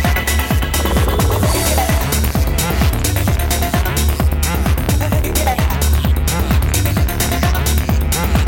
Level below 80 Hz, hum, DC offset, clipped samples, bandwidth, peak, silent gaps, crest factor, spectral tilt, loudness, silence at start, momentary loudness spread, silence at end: -18 dBFS; none; under 0.1%; under 0.1%; 19 kHz; 0 dBFS; none; 14 dB; -4.5 dB/octave; -16 LUFS; 0 s; 2 LU; 0 s